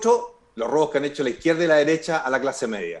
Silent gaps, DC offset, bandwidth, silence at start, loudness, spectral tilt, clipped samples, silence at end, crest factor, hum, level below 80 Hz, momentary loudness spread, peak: none; under 0.1%; 11 kHz; 0 s; -22 LUFS; -4.5 dB/octave; under 0.1%; 0 s; 16 dB; none; -60 dBFS; 9 LU; -6 dBFS